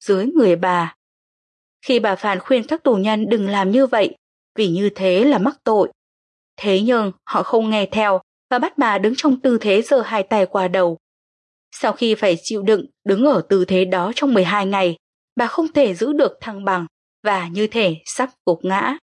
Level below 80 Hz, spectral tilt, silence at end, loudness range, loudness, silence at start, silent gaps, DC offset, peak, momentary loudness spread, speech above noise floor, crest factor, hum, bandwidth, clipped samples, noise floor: -66 dBFS; -5.5 dB/octave; 0.15 s; 2 LU; -18 LUFS; 0 s; 0.96-1.80 s, 4.18-4.55 s, 5.95-6.57 s, 8.23-8.49 s, 11.00-11.71 s, 14.99-15.36 s, 16.91-17.23 s, 18.40-18.45 s; under 0.1%; -4 dBFS; 7 LU; over 73 dB; 14 dB; none; 11.5 kHz; under 0.1%; under -90 dBFS